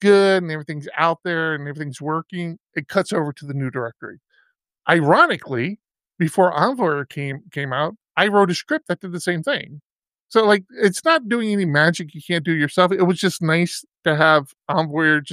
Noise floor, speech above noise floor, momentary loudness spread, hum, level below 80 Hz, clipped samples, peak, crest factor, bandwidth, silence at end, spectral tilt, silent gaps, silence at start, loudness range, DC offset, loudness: -63 dBFS; 44 dB; 13 LU; none; -70 dBFS; under 0.1%; -2 dBFS; 18 dB; 15 kHz; 0 s; -5.5 dB/octave; 9.84-9.96 s, 10.20-10.27 s; 0 s; 5 LU; under 0.1%; -20 LUFS